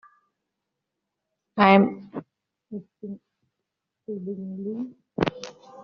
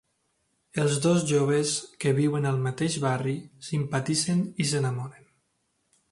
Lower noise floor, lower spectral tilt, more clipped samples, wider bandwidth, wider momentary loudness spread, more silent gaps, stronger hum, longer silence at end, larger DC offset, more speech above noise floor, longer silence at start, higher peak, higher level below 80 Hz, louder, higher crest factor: first, -83 dBFS vs -74 dBFS; about the same, -5 dB/octave vs -5 dB/octave; neither; second, 6.8 kHz vs 11.5 kHz; first, 23 LU vs 9 LU; neither; neither; second, 0 s vs 1 s; neither; first, 60 dB vs 48 dB; first, 1.55 s vs 0.75 s; first, -2 dBFS vs -10 dBFS; about the same, -62 dBFS vs -64 dBFS; about the same, -24 LUFS vs -26 LUFS; first, 26 dB vs 16 dB